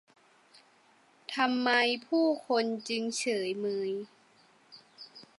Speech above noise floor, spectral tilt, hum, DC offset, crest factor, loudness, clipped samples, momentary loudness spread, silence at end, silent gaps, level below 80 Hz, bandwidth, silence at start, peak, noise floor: 34 dB; -3 dB/octave; none; under 0.1%; 20 dB; -30 LUFS; under 0.1%; 23 LU; 0.15 s; none; -88 dBFS; 11.5 kHz; 1.3 s; -12 dBFS; -64 dBFS